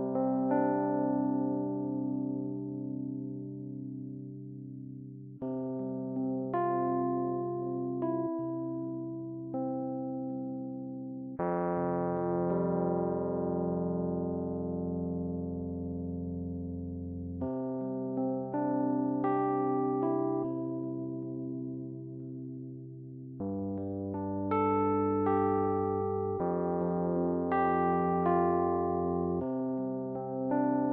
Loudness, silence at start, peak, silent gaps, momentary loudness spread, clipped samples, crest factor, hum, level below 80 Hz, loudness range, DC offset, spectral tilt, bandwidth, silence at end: -33 LUFS; 0 s; -16 dBFS; none; 12 LU; under 0.1%; 16 dB; none; -62 dBFS; 8 LU; under 0.1%; -10 dB/octave; 3.7 kHz; 0 s